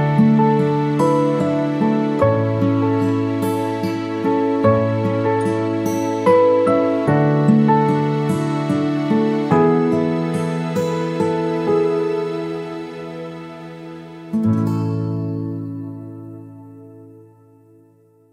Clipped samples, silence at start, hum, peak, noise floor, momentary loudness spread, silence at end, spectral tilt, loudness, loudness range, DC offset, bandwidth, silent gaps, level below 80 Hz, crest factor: under 0.1%; 0 s; none; -2 dBFS; -53 dBFS; 16 LU; 1.2 s; -8 dB/octave; -18 LUFS; 8 LU; under 0.1%; 15 kHz; none; -56 dBFS; 16 dB